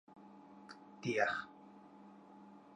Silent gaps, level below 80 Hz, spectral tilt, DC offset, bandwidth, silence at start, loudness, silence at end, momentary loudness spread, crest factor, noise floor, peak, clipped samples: none; -82 dBFS; -5 dB/octave; under 0.1%; 9.4 kHz; 0.1 s; -38 LUFS; 0 s; 23 LU; 24 dB; -59 dBFS; -20 dBFS; under 0.1%